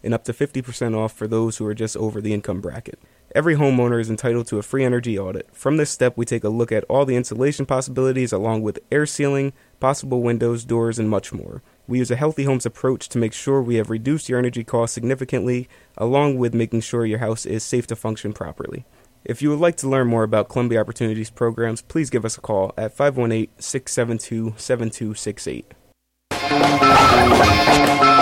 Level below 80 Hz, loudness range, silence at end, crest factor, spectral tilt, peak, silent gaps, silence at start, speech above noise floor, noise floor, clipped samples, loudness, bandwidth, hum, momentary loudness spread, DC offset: -44 dBFS; 3 LU; 0 s; 18 dB; -5.5 dB/octave; -2 dBFS; none; 0.05 s; 41 dB; -61 dBFS; under 0.1%; -20 LUFS; 16.5 kHz; none; 11 LU; under 0.1%